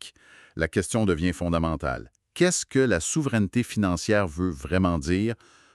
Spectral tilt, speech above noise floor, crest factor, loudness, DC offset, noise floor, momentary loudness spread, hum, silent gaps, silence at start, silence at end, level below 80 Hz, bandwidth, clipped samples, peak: -5 dB/octave; 27 dB; 18 dB; -25 LUFS; under 0.1%; -52 dBFS; 8 LU; none; none; 0 s; 0.4 s; -44 dBFS; 13 kHz; under 0.1%; -8 dBFS